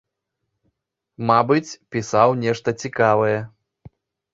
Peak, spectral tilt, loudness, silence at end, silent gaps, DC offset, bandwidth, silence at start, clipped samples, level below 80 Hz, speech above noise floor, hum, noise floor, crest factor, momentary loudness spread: -2 dBFS; -6 dB/octave; -20 LUFS; 0.85 s; none; under 0.1%; 8 kHz; 1.2 s; under 0.1%; -60 dBFS; 59 dB; none; -79 dBFS; 20 dB; 11 LU